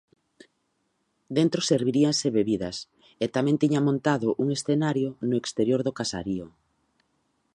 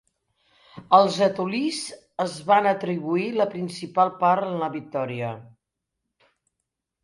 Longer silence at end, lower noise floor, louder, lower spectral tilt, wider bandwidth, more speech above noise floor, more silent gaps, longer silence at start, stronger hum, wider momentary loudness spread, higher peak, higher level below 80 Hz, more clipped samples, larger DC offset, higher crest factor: second, 1.05 s vs 1.55 s; second, -74 dBFS vs -82 dBFS; about the same, -25 LUFS vs -23 LUFS; about the same, -5.5 dB/octave vs -5.5 dB/octave; about the same, 11 kHz vs 11.5 kHz; second, 49 dB vs 60 dB; neither; first, 1.3 s vs 0.75 s; neither; second, 9 LU vs 13 LU; second, -8 dBFS vs -2 dBFS; first, -62 dBFS vs -70 dBFS; neither; neither; about the same, 18 dB vs 22 dB